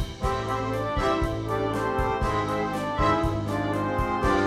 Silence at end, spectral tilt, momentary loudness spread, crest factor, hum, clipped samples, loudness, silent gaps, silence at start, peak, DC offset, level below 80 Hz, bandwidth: 0 s; -6.5 dB/octave; 4 LU; 14 dB; none; under 0.1%; -26 LUFS; none; 0 s; -10 dBFS; under 0.1%; -36 dBFS; 15.5 kHz